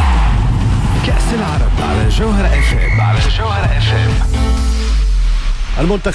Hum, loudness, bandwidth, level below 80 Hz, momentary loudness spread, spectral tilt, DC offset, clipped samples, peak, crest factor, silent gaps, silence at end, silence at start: none; -15 LUFS; 11 kHz; -14 dBFS; 3 LU; -6 dB/octave; under 0.1%; under 0.1%; -4 dBFS; 8 dB; none; 0 s; 0 s